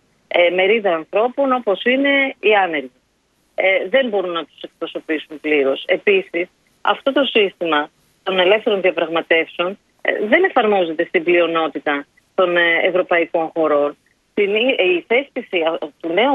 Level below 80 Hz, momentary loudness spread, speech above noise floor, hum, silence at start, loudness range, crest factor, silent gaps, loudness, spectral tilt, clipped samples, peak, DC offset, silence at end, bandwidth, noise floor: -70 dBFS; 10 LU; 46 dB; none; 0.35 s; 3 LU; 18 dB; none; -17 LUFS; -6 dB/octave; under 0.1%; 0 dBFS; under 0.1%; 0 s; 4.8 kHz; -63 dBFS